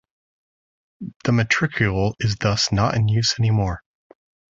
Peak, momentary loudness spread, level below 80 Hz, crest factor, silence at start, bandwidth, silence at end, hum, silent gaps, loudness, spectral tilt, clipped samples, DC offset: -4 dBFS; 9 LU; -42 dBFS; 18 dB; 1 s; 7.8 kHz; 0.8 s; none; 1.16-1.20 s; -20 LUFS; -5 dB/octave; under 0.1%; under 0.1%